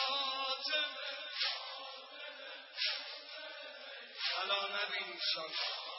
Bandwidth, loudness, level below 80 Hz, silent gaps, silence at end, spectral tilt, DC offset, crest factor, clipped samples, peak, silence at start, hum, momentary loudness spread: 6 kHz; -37 LUFS; under -90 dBFS; none; 0 s; -1.5 dB/octave; under 0.1%; 18 dB; under 0.1%; -22 dBFS; 0 s; none; 13 LU